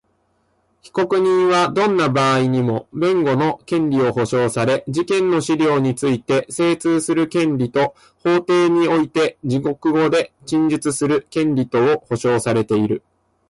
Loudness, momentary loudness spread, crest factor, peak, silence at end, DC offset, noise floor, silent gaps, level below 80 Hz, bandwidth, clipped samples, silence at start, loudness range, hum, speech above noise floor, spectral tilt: -18 LUFS; 5 LU; 10 dB; -8 dBFS; 0.5 s; under 0.1%; -64 dBFS; none; -56 dBFS; 11.5 kHz; under 0.1%; 0.85 s; 1 LU; none; 47 dB; -6 dB/octave